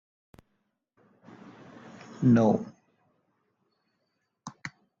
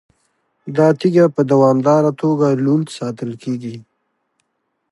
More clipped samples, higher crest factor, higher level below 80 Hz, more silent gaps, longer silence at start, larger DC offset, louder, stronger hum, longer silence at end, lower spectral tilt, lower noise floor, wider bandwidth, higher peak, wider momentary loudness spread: neither; about the same, 20 dB vs 16 dB; about the same, -66 dBFS vs -66 dBFS; neither; first, 2.2 s vs 0.65 s; neither; second, -24 LUFS vs -16 LUFS; neither; second, 0.3 s vs 1.1 s; about the same, -8.5 dB/octave vs -8 dB/octave; first, -79 dBFS vs -71 dBFS; second, 7.4 kHz vs 11.5 kHz; second, -12 dBFS vs -2 dBFS; first, 28 LU vs 13 LU